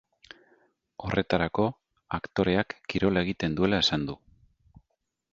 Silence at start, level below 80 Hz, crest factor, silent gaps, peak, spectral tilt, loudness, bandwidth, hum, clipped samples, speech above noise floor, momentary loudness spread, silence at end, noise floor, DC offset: 1 s; -50 dBFS; 24 dB; none; -6 dBFS; -6 dB/octave; -27 LUFS; 7.8 kHz; none; under 0.1%; 53 dB; 12 LU; 1.15 s; -80 dBFS; under 0.1%